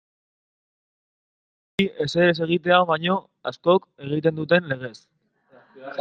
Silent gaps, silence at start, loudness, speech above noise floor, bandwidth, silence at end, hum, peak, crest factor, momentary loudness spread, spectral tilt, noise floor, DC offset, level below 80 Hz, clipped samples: none; 1.8 s; -22 LUFS; 35 dB; 8.8 kHz; 0 s; none; -2 dBFS; 22 dB; 14 LU; -6.5 dB/octave; -57 dBFS; under 0.1%; -64 dBFS; under 0.1%